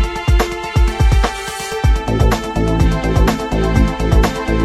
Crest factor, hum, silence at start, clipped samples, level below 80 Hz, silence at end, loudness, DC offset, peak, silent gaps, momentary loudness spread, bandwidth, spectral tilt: 14 dB; none; 0 s; under 0.1%; -16 dBFS; 0 s; -16 LUFS; under 0.1%; 0 dBFS; none; 3 LU; 13.5 kHz; -6 dB/octave